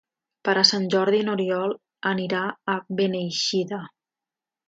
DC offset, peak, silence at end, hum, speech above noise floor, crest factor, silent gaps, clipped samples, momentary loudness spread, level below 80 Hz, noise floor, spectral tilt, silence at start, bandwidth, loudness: under 0.1%; -2 dBFS; 0.8 s; none; 66 dB; 22 dB; none; under 0.1%; 11 LU; -72 dBFS; -90 dBFS; -4 dB/octave; 0.45 s; 8 kHz; -23 LUFS